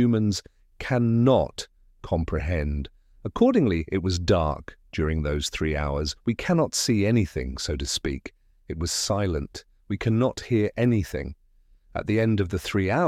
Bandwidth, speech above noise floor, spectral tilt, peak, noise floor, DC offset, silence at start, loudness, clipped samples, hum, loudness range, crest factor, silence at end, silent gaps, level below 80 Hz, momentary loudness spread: 15.5 kHz; 34 dB; -5.5 dB/octave; -8 dBFS; -58 dBFS; under 0.1%; 0 s; -25 LUFS; under 0.1%; none; 2 LU; 18 dB; 0 s; none; -38 dBFS; 15 LU